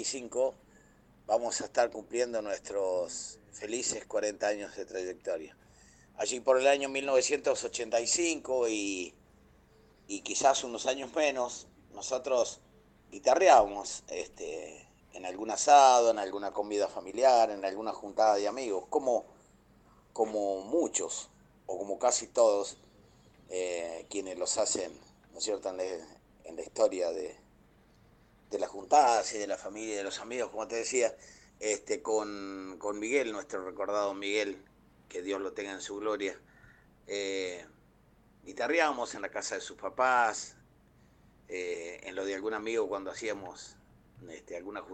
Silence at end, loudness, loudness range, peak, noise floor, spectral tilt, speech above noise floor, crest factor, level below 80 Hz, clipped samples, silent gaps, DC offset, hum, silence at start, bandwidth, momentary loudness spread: 0 s; -31 LUFS; 9 LU; -8 dBFS; -63 dBFS; -1.5 dB/octave; 32 dB; 24 dB; -68 dBFS; under 0.1%; none; under 0.1%; none; 0 s; 9.4 kHz; 16 LU